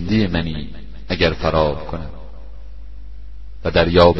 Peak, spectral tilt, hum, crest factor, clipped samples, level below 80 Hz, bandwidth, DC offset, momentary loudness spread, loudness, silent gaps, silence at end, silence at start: 0 dBFS; -7.5 dB/octave; 50 Hz at -35 dBFS; 20 dB; under 0.1%; -32 dBFS; 6.2 kHz; 3%; 23 LU; -19 LUFS; none; 0 s; 0 s